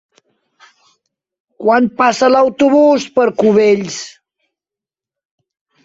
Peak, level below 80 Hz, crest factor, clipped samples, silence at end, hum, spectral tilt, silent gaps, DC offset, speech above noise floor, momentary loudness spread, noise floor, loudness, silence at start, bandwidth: 0 dBFS; -60 dBFS; 14 dB; under 0.1%; 1.75 s; none; -5 dB/octave; none; under 0.1%; 76 dB; 10 LU; -88 dBFS; -12 LUFS; 1.6 s; 8 kHz